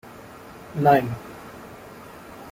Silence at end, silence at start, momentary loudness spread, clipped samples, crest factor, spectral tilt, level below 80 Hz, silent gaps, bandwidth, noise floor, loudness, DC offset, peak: 0 s; 0.05 s; 24 LU; under 0.1%; 22 dB; -7 dB/octave; -56 dBFS; none; 16.5 kHz; -43 dBFS; -22 LUFS; under 0.1%; -4 dBFS